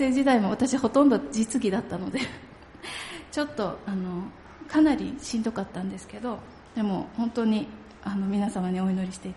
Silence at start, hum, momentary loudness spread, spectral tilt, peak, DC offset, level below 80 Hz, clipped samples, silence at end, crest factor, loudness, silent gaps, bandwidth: 0 s; none; 15 LU; -5.5 dB/octave; -8 dBFS; under 0.1%; -56 dBFS; under 0.1%; 0 s; 18 dB; -27 LUFS; none; 11.5 kHz